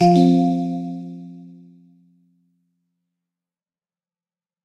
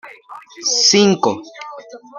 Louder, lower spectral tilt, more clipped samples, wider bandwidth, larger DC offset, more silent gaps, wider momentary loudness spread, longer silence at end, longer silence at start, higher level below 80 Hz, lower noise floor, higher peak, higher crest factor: second, -18 LUFS vs -14 LUFS; first, -8.5 dB/octave vs -3 dB/octave; neither; second, 8.4 kHz vs 11 kHz; neither; neither; first, 25 LU vs 22 LU; first, 3.15 s vs 0 s; about the same, 0 s vs 0.05 s; about the same, -66 dBFS vs -62 dBFS; first, under -90 dBFS vs -38 dBFS; second, -4 dBFS vs 0 dBFS; about the same, 20 dB vs 18 dB